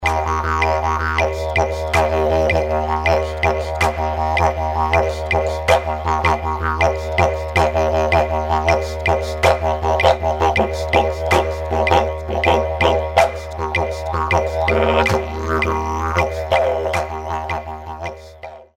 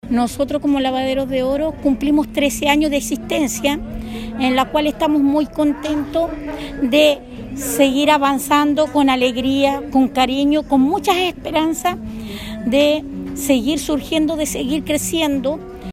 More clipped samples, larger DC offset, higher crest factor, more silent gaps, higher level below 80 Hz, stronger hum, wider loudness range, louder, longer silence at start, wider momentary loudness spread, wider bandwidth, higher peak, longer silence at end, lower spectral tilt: neither; neither; about the same, 18 dB vs 18 dB; neither; first, -28 dBFS vs -38 dBFS; neither; about the same, 2 LU vs 3 LU; about the same, -18 LUFS vs -17 LUFS; about the same, 0 s vs 0.05 s; second, 6 LU vs 10 LU; about the same, 15 kHz vs 16 kHz; about the same, 0 dBFS vs 0 dBFS; about the same, 0.1 s vs 0 s; first, -5.5 dB/octave vs -4 dB/octave